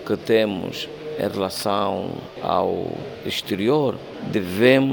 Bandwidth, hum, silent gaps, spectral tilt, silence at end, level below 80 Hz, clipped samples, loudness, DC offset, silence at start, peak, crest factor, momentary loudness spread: 19 kHz; none; none; -5.5 dB/octave; 0 s; -58 dBFS; under 0.1%; -23 LUFS; under 0.1%; 0 s; -4 dBFS; 18 dB; 12 LU